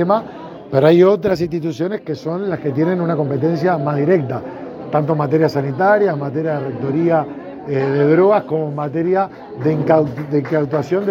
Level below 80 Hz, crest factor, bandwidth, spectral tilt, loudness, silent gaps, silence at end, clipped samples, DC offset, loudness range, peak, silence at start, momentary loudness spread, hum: -56 dBFS; 16 dB; 7.4 kHz; -9 dB/octave; -17 LUFS; none; 0 s; under 0.1%; under 0.1%; 2 LU; 0 dBFS; 0 s; 10 LU; none